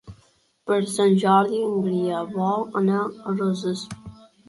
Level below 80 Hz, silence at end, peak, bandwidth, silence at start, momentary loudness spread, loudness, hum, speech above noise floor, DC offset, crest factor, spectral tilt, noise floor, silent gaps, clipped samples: -60 dBFS; 0.35 s; -6 dBFS; 11.5 kHz; 0.05 s; 11 LU; -23 LUFS; none; 39 dB; under 0.1%; 18 dB; -6.5 dB/octave; -61 dBFS; none; under 0.1%